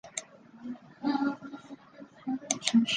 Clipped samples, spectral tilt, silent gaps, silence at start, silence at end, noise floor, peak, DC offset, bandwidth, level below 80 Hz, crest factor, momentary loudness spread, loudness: under 0.1%; -2.5 dB/octave; none; 0.05 s; 0 s; -52 dBFS; -6 dBFS; under 0.1%; 10 kHz; -74 dBFS; 26 dB; 22 LU; -32 LUFS